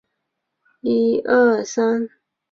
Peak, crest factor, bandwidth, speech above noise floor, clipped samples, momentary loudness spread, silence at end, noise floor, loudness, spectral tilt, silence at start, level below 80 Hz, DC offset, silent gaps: -4 dBFS; 16 dB; 7.6 kHz; 60 dB; under 0.1%; 11 LU; 0.45 s; -77 dBFS; -19 LUFS; -5 dB/octave; 0.85 s; -62 dBFS; under 0.1%; none